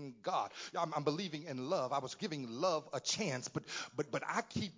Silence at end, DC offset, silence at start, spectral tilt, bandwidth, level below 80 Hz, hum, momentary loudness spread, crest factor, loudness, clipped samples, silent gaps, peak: 0 s; under 0.1%; 0 s; -4 dB/octave; 7.8 kHz; -72 dBFS; none; 6 LU; 20 dB; -39 LUFS; under 0.1%; none; -20 dBFS